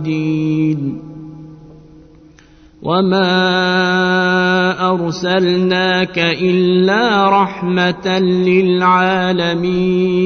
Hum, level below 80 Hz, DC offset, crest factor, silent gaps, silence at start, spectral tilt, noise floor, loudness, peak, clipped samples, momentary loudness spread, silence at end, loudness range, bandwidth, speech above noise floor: none; -48 dBFS; under 0.1%; 14 dB; none; 0 s; -6.5 dB/octave; -44 dBFS; -14 LUFS; 0 dBFS; under 0.1%; 6 LU; 0 s; 5 LU; 6.6 kHz; 31 dB